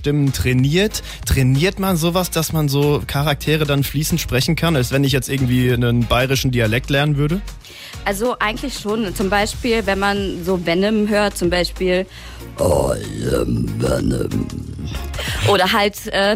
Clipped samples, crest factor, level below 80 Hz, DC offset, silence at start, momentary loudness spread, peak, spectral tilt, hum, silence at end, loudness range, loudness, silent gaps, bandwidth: under 0.1%; 14 dB; -32 dBFS; under 0.1%; 0 s; 8 LU; -4 dBFS; -5 dB/octave; none; 0 s; 3 LU; -18 LUFS; none; 16 kHz